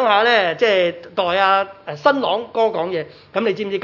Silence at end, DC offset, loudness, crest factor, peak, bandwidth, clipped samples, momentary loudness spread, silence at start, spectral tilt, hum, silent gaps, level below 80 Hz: 0 s; under 0.1%; -18 LUFS; 16 dB; -2 dBFS; 6 kHz; under 0.1%; 9 LU; 0 s; -5 dB/octave; none; none; -66 dBFS